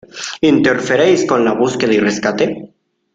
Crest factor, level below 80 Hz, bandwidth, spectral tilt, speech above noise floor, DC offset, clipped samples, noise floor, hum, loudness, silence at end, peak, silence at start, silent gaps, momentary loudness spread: 14 dB; -54 dBFS; 9.2 kHz; -5 dB/octave; 32 dB; under 0.1%; under 0.1%; -45 dBFS; none; -14 LUFS; 0.5 s; 0 dBFS; 0.15 s; none; 7 LU